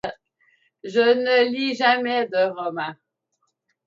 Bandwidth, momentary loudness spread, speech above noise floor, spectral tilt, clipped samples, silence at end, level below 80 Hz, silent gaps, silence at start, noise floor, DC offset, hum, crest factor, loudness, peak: 7.6 kHz; 14 LU; 53 dB; -4.5 dB/octave; under 0.1%; 0.95 s; -68 dBFS; none; 0.05 s; -74 dBFS; under 0.1%; none; 18 dB; -21 LUFS; -6 dBFS